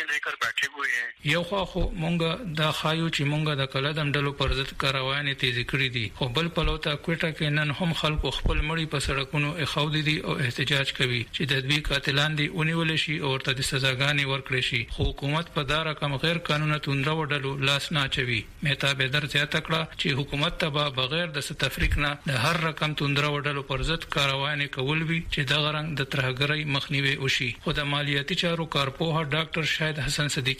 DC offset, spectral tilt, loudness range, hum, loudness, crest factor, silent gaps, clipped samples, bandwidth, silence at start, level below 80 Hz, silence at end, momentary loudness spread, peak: under 0.1%; -4.5 dB/octave; 2 LU; none; -26 LUFS; 18 dB; none; under 0.1%; 15.5 kHz; 0 s; -40 dBFS; 0 s; 4 LU; -8 dBFS